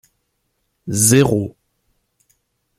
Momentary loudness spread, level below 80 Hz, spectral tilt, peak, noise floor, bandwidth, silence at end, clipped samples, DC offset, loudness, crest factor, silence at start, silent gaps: 19 LU; -50 dBFS; -4.5 dB/octave; 0 dBFS; -70 dBFS; 16 kHz; 1.3 s; under 0.1%; under 0.1%; -15 LUFS; 20 dB; 0.85 s; none